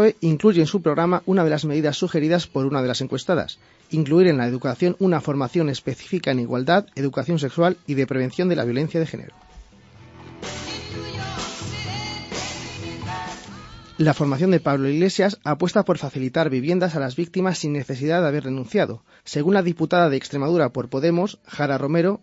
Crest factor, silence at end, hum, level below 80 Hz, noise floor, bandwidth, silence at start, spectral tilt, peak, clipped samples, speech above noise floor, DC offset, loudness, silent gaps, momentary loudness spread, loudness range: 18 dB; 0.05 s; none; -54 dBFS; -47 dBFS; 8 kHz; 0 s; -6.5 dB/octave; -2 dBFS; under 0.1%; 27 dB; under 0.1%; -22 LUFS; none; 12 LU; 9 LU